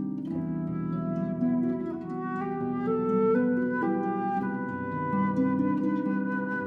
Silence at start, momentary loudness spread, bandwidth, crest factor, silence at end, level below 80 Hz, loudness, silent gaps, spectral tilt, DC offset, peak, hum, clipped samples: 0 s; 7 LU; 3.8 kHz; 14 dB; 0 s; -62 dBFS; -29 LUFS; none; -10.5 dB/octave; under 0.1%; -14 dBFS; none; under 0.1%